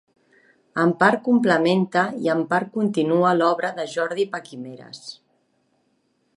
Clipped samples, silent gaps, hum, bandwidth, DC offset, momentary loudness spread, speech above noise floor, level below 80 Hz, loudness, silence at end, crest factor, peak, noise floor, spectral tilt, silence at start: under 0.1%; none; none; 11.5 kHz; under 0.1%; 19 LU; 47 dB; -74 dBFS; -21 LUFS; 1.25 s; 20 dB; -2 dBFS; -68 dBFS; -6 dB/octave; 0.75 s